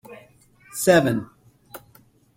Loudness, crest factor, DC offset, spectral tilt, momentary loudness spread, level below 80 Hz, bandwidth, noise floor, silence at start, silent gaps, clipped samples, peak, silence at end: -20 LUFS; 22 dB; under 0.1%; -5 dB/octave; 26 LU; -60 dBFS; 16.5 kHz; -56 dBFS; 0.1 s; none; under 0.1%; -4 dBFS; 0.6 s